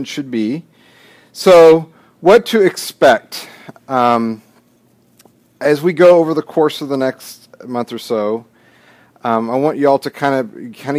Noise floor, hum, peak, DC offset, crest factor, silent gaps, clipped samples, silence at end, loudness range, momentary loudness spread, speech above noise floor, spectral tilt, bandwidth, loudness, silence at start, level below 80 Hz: -54 dBFS; none; 0 dBFS; under 0.1%; 14 dB; none; under 0.1%; 0 s; 7 LU; 18 LU; 40 dB; -5.5 dB/octave; 16 kHz; -14 LUFS; 0 s; -58 dBFS